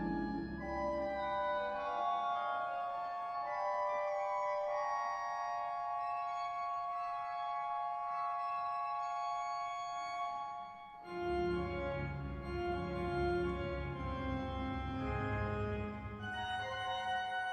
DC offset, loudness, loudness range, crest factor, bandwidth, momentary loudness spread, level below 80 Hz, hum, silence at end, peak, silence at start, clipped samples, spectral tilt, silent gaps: under 0.1%; -39 LUFS; 2 LU; 14 dB; 9.4 kHz; 5 LU; -52 dBFS; none; 0 s; -26 dBFS; 0 s; under 0.1%; -6.5 dB/octave; none